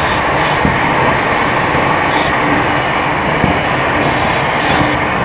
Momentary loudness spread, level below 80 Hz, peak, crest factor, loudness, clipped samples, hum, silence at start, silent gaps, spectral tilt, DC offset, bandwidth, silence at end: 1 LU; -32 dBFS; 0 dBFS; 12 dB; -12 LUFS; under 0.1%; none; 0 s; none; -9 dB/octave; under 0.1%; 4 kHz; 0 s